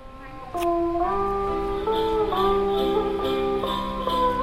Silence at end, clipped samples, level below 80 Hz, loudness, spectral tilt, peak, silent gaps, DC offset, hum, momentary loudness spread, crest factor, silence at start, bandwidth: 0 s; under 0.1%; -38 dBFS; -24 LUFS; -6 dB/octave; -10 dBFS; none; under 0.1%; none; 5 LU; 14 dB; 0 s; 16 kHz